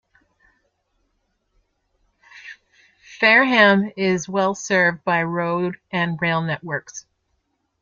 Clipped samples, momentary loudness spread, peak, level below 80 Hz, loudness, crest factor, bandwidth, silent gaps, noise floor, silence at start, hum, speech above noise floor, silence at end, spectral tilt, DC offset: under 0.1%; 15 LU; 0 dBFS; -64 dBFS; -19 LUFS; 22 dB; 7.6 kHz; none; -71 dBFS; 2.35 s; none; 52 dB; 0.8 s; -4.5 dB/octave; under 0.1%